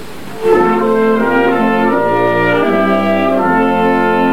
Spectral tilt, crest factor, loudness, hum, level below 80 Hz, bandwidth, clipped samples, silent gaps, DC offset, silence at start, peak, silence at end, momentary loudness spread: -7 dB/octave; 10 dB; -12 LUFS; none; -46 dBFS; 18 kHz; under 0.1%; none; 4%; 0 s; -2 dBFS; 0 s; 1 LU